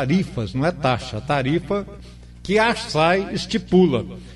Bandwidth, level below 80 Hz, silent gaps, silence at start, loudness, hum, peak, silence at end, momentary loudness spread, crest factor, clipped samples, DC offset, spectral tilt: 11.5 kHz; -42 dBFS; none; 0 s; -21 LUFS; 60 Hz at -40 dBFS; -6 dBFS; 0 s; 9 LU; 16 dB; under 0.1%; under 0.1%; -6 dB/octave